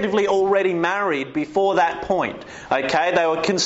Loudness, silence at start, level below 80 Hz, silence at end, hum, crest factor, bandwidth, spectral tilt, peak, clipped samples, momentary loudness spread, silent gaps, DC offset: -20 LUFS; 0 s; -54 dBFS; 0 s; none; 14 dB; 8 kHz; -2.5 dB/octave; -6 dBFS; under 0.1%; 6 LU; none; under 0.1%